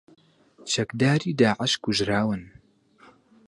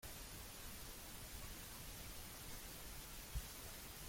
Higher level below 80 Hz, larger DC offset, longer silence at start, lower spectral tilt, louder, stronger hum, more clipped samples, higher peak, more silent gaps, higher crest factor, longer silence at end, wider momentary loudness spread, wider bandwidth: about the same, -56 dBFS vs -56 dBFS; neither; first, 0.6 s vs 0 s; first, -4.5 dB/octave vs -2.5 dB/octave; first, -24 LUFS vs -52 LUFS; neither; neither; first, -6 dBFS vs -34 dBFS; neither; about the same, 20 dB vs 18 dB; first, 1 s vs 0 s; first, 7 LU vs 2 LU; second, 11.5 kHz vs 16.5 kHz